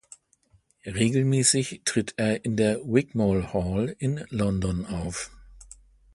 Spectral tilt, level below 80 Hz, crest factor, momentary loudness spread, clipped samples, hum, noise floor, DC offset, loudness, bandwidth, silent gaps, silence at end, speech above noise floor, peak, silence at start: -5 dB/octave; -46 dBFS; 20 dB; 11 LU; under 0.1%; none; -64 dBFS; under 0.1%; -26 LUFS; 11.5 kHz; none; 0.5 s; 39 dB; -6 dBFS; 0.85 s